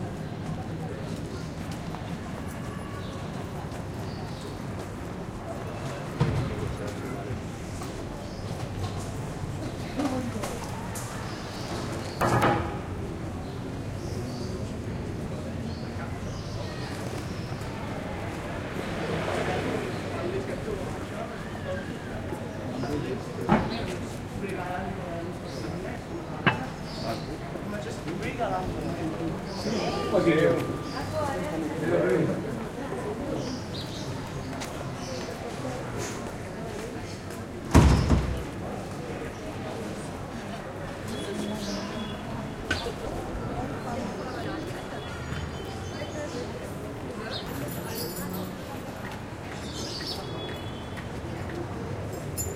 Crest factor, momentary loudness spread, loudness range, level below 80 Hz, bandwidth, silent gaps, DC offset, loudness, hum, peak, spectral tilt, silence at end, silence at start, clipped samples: 26 dB; 9 LU; 8 LU; -42 dBFS; 16 kHz; none; under 0.1%; -32 LUFS; none; -4 dBFS; -6 dB/octave; 0 s; 0 s; under 0.1%